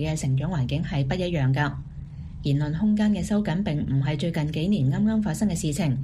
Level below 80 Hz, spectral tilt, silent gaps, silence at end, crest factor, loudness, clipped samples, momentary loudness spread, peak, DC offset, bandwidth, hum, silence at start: -42 dBFS; -6.5 dB/octave; none; 0 s; 14 dB; -25 LUFS; under 0.1%; 5 LU; -10 dBFS; under 0.1%; 14.5 kHz; none; 0 s